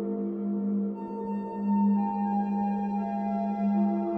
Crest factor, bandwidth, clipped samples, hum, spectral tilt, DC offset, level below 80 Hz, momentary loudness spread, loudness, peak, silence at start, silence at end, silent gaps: 10 dB; 2.9 kHz; under 0.1%; none; -11.5 dB/octave; under 0.1%; -68 dBFS; 7 LU; -29 LUFS; -18 dBFS; 0 s; 0 s; none